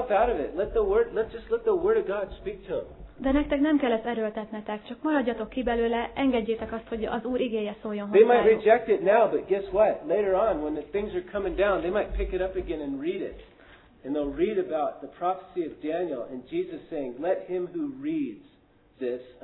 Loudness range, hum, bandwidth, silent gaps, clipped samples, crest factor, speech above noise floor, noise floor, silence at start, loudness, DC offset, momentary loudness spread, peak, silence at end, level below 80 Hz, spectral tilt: 8 LU; none; 4.1 kHz; none; under 0.1%; 20 dB; 33 dB; -60 dBFS; 0 s; -27 LUFS; under 0.1%; 12 LU; -6 dBFS; 0.1 s; -46 dBFS; -10 dB/octave